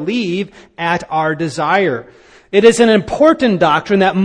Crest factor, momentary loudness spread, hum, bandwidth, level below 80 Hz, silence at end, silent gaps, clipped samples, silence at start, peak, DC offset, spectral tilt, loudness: 14 dB; 10 LU; none; 10.5 kHz; -48 dBFS; 0 s; none; 0.1%; 0 s; 0 dBFS; under 0.1%; -5.5 dB/octave; -14 LUFS